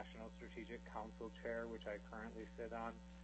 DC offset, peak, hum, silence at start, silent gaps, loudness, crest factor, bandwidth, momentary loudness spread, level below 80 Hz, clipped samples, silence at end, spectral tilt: under 0.1%; -34 dBFS; none; 0 s; none; -50 LUFS; 16 dB; 8.2 kHz; 7 LU; -62 dBFS; under 0.1%; 0 s; -6.5 dB/octave